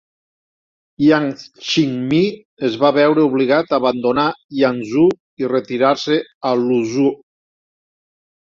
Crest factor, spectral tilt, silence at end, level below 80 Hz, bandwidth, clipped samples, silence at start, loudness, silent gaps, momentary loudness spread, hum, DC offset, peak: 16 dB; -6 dB/octave; 1.3 s; -58 dBFS; 7.6 kHz; under 0.1%; 1 s; -17 LUFS; 2.45-2.57 s, 4.44-4.49 s, 5.20-5.37 s, 6.35-6.41 s; 7 LU; none; under 0.1%; -2 dBFS